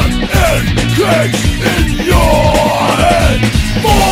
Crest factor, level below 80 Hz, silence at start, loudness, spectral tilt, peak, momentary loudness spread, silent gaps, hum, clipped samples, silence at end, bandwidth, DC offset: 10 dB; -18 dBFS; 0 s; -11 LUFS; -5 dB/octave; 0 dBFS; 3 LU; none; none; 0.3%; 0 s; 16.5 kHz; under 0.1%